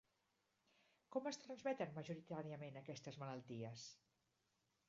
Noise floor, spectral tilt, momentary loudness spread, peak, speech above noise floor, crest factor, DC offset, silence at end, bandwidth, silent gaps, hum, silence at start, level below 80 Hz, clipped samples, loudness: -86 dBFS; -5.5 dB/octave; 8 LU; -30 dBFS; 36 dB; 22 dB; under 0.1%; 0.95 s; 7.4 kHz; none; none; 1.1 s; -90 dBFS; under 0.1%; -50 LUFS